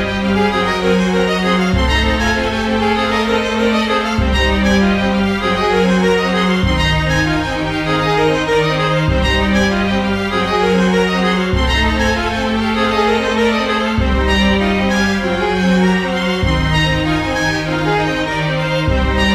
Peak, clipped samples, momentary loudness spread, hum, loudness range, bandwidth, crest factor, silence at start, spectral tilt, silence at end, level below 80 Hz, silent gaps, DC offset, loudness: -2 dBFS; under 0.1%; 3 LU; none; 1 LU; 14 kHz; 12 dB; 0 s; -5.5 dB/octave; 0 s; -24 dBFS; none; under 0.1%; -15 LUFS